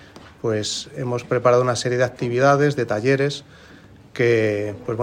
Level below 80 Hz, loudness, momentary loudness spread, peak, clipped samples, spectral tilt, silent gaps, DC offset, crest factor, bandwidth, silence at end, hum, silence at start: -56 dBFS; -20 LUFS; 10 LU; -2 dBFS; under 0.1%; -5.5 dB/octave; none; under 0.1%; 18 dB; 15.5 kHz; 0 s; none; 0.15 s